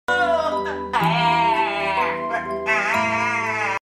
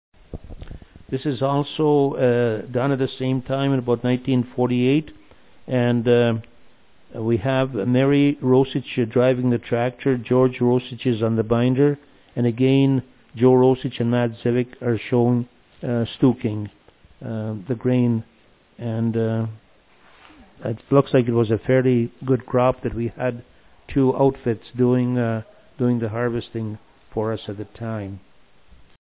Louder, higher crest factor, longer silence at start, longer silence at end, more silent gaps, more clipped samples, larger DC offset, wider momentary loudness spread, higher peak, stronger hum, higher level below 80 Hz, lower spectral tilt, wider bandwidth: about the same, -20 LUFS vs -21 LUFS; about the same, 14 dB vs 18 dB; second, 0.1 s vs 0.3 s; second, 0.05 s vs 0.85 s; neither; neither; neither; second, 6 LU vs 14 LU; second, -8 dBFS vs -4 dBFS; neither; about the same, -52 dBFS vs -50 dBFS; second, -4.5 dB/octave vs -12 dB/octave; first, 15.5 kHz vs 4 kHz